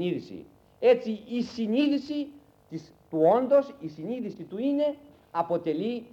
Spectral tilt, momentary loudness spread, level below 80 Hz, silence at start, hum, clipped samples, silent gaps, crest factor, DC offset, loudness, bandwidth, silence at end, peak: -7.5 dB/octave; 19 LU; -70 dBFS; 0 s; none; under 0.1%; none; 18 dB; under 0.1%; -27 LUFS; 7.6 kHz; 0.05 s; -10 dBFS